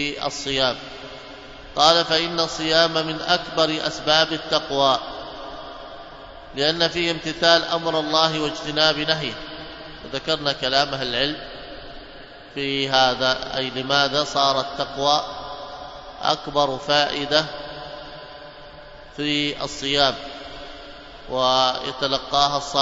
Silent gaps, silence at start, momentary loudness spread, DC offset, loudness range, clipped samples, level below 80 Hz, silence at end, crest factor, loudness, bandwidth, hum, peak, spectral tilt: none; 0 s; 20 LU; under 0.1%; 4 LU; under 0.1%; -48 dBFS; 0 s; 22 dB; -20 LUFS; 8 kHz; none; 0 dBFS; -3 dB/octave